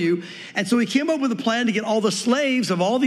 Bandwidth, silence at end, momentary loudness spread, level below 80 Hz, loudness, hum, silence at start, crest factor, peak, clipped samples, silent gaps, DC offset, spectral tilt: 13 kHz; 0 s; 5 LU; -78 dBFS; -21 LUFS; none; 0 s; 16 dB; -6 dBFS; under 0.1%; none; under 0.1%; -4.5 dB/octave